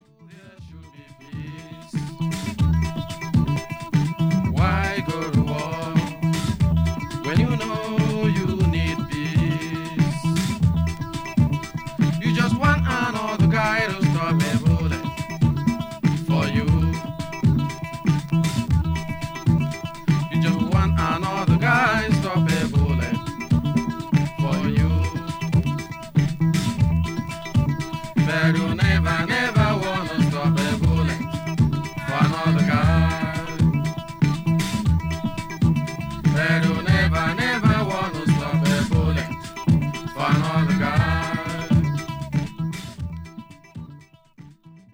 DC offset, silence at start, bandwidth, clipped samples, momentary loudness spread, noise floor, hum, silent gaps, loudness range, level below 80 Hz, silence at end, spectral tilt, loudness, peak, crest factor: under 0.1%; 0.2 s; 16.5 kHz; under 0.1%; 9 LU; -47 dBFS; none; none; 3 LU; -34 dBFS; 0.15 s; -6.5 dB/octave; -22 LUFS; -4 dBFS; 18 dB